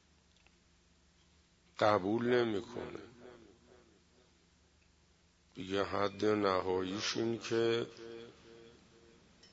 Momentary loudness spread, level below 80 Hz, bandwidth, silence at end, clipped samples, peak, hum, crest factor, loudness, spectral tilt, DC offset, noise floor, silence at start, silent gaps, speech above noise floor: 24 LU; -72 dBFS; 7.6 kHz; 0.8 s; under 0.1%; -16 dBFS; none; 22 dB; -34 LUFS; -4 dB/octave; under 0.1%; -69 dBFS; 1.8 s; none; 35 dB